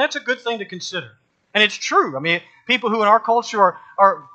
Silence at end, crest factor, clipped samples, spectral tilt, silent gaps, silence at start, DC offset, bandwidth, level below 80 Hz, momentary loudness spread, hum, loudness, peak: 0.1 s; 18 dB; under 0.1%; -3 dB/octave; none; 0 s; under 0.1%; 9 kHz; -74 dBFS; 11 LU; none; -18 LUFS; 0 dBFS